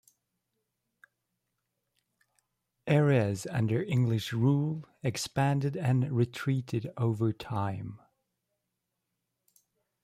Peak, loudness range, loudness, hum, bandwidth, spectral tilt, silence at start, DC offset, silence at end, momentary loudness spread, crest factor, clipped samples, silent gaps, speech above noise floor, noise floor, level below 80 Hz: -14 dBFS; 6 LU; -30 LUFS; none; 15 kHz; -7 dB/octave; 2.85 s; under 0.1%; 2.05 s; 9 LU; 18 dB; under 0.1%; none; 55 dB; -84 dBFS; -66 dBFS